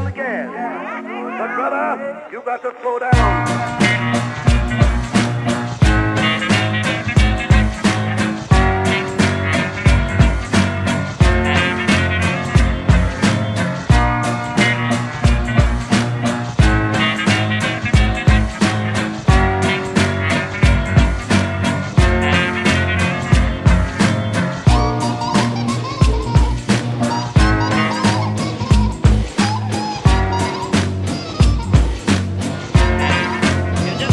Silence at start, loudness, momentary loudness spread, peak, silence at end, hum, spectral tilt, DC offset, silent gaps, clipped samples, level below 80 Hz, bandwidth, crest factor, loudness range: 0 s; -17 LUFS; 6 LU; 0 dBFS; 0 s; none; -5.5 dB/octave; under 0.1%; none; under 0.1%; -22 dBFS; 11.5 kHz; 16 dB; 2 LU